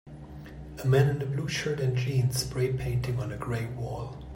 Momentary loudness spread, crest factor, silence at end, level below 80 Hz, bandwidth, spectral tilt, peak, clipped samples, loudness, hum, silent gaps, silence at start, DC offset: 19 LU; 18 dB; 0 s; -46 dBFS; 16 kHz; -6 dB/octave; -12 dBFS; under 0.1%; -29 LUFS; none; none; 0.05 s; under 0.1%